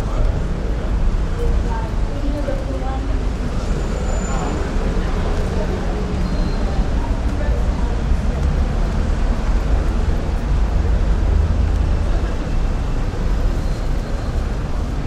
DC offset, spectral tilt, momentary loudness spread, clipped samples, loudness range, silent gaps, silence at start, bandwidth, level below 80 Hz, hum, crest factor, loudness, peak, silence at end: under 0.1%; -7 dB/octave; 4 LU; under 0.1%; 3 LU; none; 0 s; 9.4 kHz; -18 dBFS; none; 14 dB; -22 LUFS; -4 dBFS; 0 s